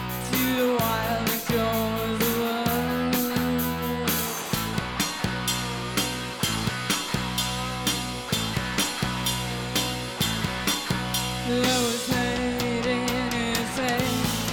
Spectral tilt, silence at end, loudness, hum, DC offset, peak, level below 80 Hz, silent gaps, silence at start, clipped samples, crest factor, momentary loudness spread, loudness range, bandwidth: -3.5 dB/octave; 0 s; -25 LUFS; none; under 0.1%; -10 dBFS; -44 dBFS; none; 0 s; under 0.1%; 16 dB; 3 LU; 2 LU; 19 kHz